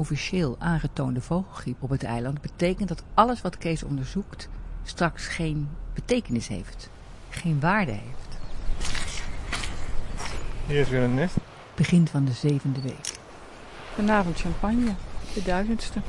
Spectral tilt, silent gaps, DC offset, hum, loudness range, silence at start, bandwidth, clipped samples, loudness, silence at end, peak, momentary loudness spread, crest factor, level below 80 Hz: -6 dB/octave; none; under 0.1%; none; 4 LU; 0 s; 11.5 kHz; under 0.1%; -27 LUFS; 0 s; -4 dBFS; 16 LU; 22 dB; -36 dBFS